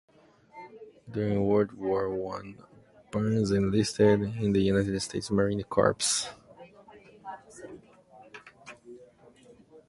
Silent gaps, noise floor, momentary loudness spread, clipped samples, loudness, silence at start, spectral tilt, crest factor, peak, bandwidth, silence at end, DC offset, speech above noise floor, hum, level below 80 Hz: none; -56 dBFS; 24 LU; under 0.1%; -27 LUFS; 0.55 s; -5 dB/octave; 22 dB; -8 dBFS; 11.5 kHz; 0.1 s; under 0.1%; 29 dB; none; -54 dBFS